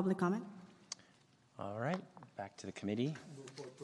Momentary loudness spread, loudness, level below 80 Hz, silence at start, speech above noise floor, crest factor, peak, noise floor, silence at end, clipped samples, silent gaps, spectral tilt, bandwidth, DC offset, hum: 16 LU; -42 LUFS; -84 dBFS; 0 s; 29 dB; 20 dB; -22 dBFS; -69 dBFS; 0 s; under 0.1%; none; -6 dB/octave; 11.5 kHz; under 0.1%; none